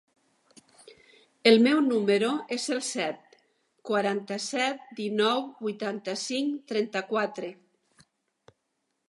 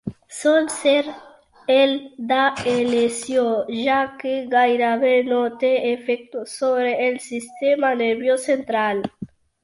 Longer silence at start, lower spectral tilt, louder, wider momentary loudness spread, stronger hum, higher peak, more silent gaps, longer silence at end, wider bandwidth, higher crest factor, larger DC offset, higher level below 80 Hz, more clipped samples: first, 1.45 s vs 0.05 s; about the same, -4 dB/octave vs -3.5 dB/octave; second, -27 LUFS vs -20 LUFS; about the same, 12 LU vs 10 LU; neither; about the same, -4 dBFS vs -6 dBFS; neither; first, 1.55 s vs 0.4 s; about the same, 11.5 kHz vs 11.5 kHz; first, 24 dB vs 14 dB; neither; second, -82 dBFS vs -62 dBFS; neither